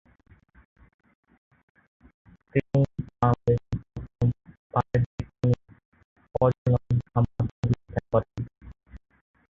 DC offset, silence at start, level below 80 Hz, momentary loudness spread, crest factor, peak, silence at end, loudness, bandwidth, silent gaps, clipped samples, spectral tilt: under 0.1%; 2.55 s; -46 dBFS; 11 LU; 22 dB; -6 dBFS; 0.6 s; -27 LUFS; 6.6 kHz; 4.59-4.70 s, 5.06-5.18 s, 5.85-5.92 s, 6.04-6.16 s, 6.58-6.65 s, 7.51-7.63 s; under 0.1%; -10 dB/octave